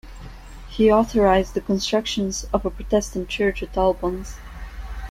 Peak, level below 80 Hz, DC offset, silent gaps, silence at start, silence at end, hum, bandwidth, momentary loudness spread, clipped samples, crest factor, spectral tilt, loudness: -4 dBFS; -36 dBFS; under 0.1%; none; 0.05 s; 0 s; none; 15.5 kHz; 20 LU; under 0.1%; 18 dB; -5 dB/octave; -21 LUFS